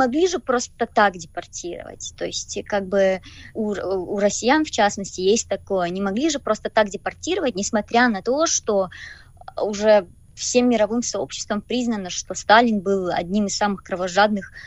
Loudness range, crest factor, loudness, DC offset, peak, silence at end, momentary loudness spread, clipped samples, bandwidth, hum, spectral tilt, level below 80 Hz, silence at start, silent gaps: 3 LU; 20 dB; -21 LUFS; under 0.1%; -2 dBFS; 0 s; 12 LU; under 0.1%; 10.5 kHz; none; -3.5 dB/octave; -50 dBFS; 0 s; none